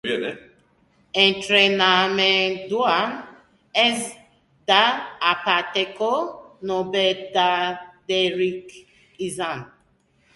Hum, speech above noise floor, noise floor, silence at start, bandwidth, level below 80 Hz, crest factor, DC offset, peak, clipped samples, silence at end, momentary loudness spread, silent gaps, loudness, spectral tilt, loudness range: none; 41 dB; -62 dBFS; 0.05 s; 11.5 kHz; -64 dBFS; 20 dB; under 0.1%; -2 dBFS; under 0.1%; 0.7 s; 16 LU; none; -20 LUFS; -3 dB/octave; 5 LU